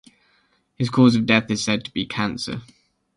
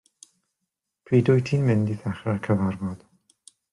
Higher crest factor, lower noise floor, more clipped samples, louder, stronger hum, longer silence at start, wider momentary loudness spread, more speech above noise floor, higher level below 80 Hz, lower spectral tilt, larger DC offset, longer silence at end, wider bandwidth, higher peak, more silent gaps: about the same, 20 dB vs 18 dB; second, -64 dBFS vs -82 dBFS; neither; first, -21 LUFS vs -24 LUFS; neither; second, 0.8 s vs 1.1 s; about the same, 13 LU vs 13 LU; second, 44 dB vs 60 dB; first, -54 dBFS vs -60 dBFS; second, -5 dB/octave vs -8.5 dB/octave; neither; second, 0.5 s vs 0.75 s; about the same, 11.5 kHz vs 11 kHz; first, -2 dBFS vs -8 dBFS; neither